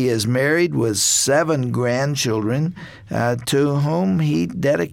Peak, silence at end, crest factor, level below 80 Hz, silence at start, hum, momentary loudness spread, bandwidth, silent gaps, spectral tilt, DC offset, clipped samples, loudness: -6 dBFS; 0 s; 12 dB; -52 dBFS; 0 s; none; 7 LU; 17 kHz; none; -4.5 dB/octave; under 0.1%; under 0.1%; -19 LUFS